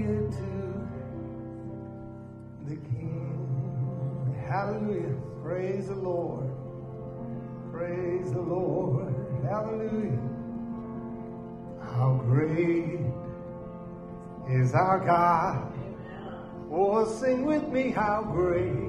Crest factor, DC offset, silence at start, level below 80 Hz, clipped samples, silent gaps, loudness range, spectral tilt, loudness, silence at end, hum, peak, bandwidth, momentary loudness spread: 20 dB; under 0.1%; 0 s; -52 dBFS; under 0.1%; none; 7 LU; -9 dB/octave; -30 LUFS; 0 s; none; -10 dBFS; 10.5 kHz; 15 LU